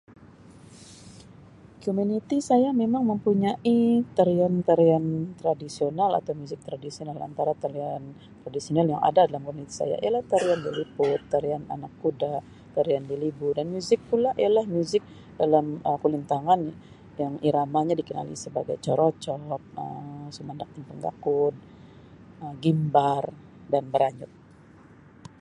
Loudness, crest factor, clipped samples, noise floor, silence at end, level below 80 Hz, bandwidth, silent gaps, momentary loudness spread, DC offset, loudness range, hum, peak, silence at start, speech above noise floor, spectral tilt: -26 LUFS; 20 dB; under 0.1%; -51 dBFS; 1.15 s; -62 dBFS; 11 kHz; none; 15 LU; under 0.1%; 6 LU; none; -6 dBFS; 0.2 s; 26 dB; -7 dB/octave